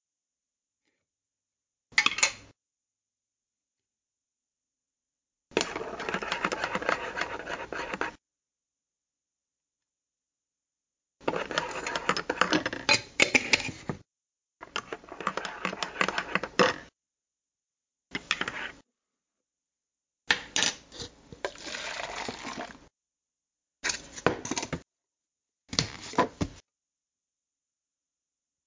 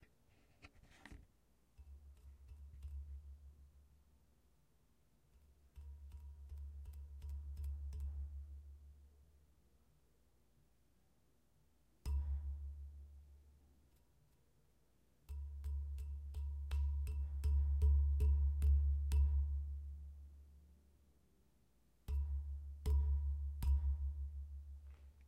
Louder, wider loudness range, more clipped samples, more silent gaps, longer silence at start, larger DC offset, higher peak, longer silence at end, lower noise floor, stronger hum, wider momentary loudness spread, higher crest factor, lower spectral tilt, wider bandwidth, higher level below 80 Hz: first, -30 LUFS vs -42 LUFS; second, 11 LU vs 22 LU; neither; neither; first, 1.9 s vs 0.65 s; neither; first, -6 dBFS vs -24 dBFS; first, 2.05 s vs 0 s; first, under -90 dBFS vs -77 dBFS; neither; second, 15 LU vs 24 LU; first, 28 dB vs 18 dB; second, -2 dB/octave vs -7.5 dB/octave; second, 7.8 kHz vs 8.6 kHz; second, -60 dBFS vs -42 dBFS